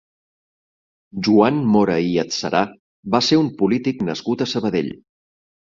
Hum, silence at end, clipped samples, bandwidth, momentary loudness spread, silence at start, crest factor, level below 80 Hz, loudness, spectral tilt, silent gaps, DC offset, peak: none; 0.8 s; under 0.1%; 7.6 kHz; 9 LU; 1.15 s; 18 dB; -56 dBFS; -19 LUFS; -5.5 dB/octave; 2.79-3.03 s; under 0.1%; -2 dBFS